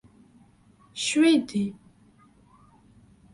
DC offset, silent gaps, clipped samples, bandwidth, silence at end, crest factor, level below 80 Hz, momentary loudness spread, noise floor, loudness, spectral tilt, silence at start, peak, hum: under 0.1%; none; under 0.1%; 11.5 kHz; 1.6 s; 18 dB; -66 dBFS; 13 LU; -58 dBFS; -24 LUFS; -4 dB/octave; 0.95 s; -10 dBFS; none